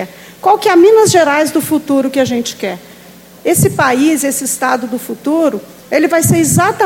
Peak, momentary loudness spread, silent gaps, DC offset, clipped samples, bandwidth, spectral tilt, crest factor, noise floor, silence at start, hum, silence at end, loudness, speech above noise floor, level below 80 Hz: 0 dBFS; 13 LU; none; under 0.1%; under 0.1%; 17 kHz; -4.5 dB/octave; 12 dB; -38 dBFS; 0 s; none; 0 s; -12 LUFS; 26 dB; -48 dBFS